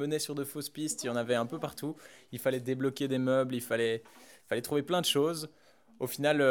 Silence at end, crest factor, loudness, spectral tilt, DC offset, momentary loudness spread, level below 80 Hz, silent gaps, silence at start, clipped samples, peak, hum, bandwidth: 0 s; 20 dB; -32 LUFS; -4 dB/octave; under 0.1%; 11 LU; -76 dBFS; none; 0 s; under 0.1%; -12 dBFS; none; over 20 kHz